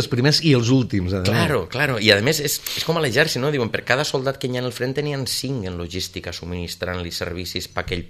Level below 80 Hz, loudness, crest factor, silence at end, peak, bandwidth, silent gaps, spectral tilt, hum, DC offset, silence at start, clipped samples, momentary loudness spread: -46 dBFS; -21 LUFS; 22 dB; 0 s; 0 dBFS; 14 kHz; none; -4.5 dB/octave; none; under 0.1%; 0 s; under 0.1%; 11 LU